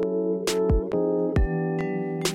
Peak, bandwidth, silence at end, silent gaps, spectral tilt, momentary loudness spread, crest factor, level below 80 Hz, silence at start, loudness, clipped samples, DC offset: -12 dBFS; 16.5 kHz; 0 s; none; -6 dB/octave; 3 LU; 12 dB; -32 dBFS; 0 s; -25 LUFS; under 0.1%; under 0.1%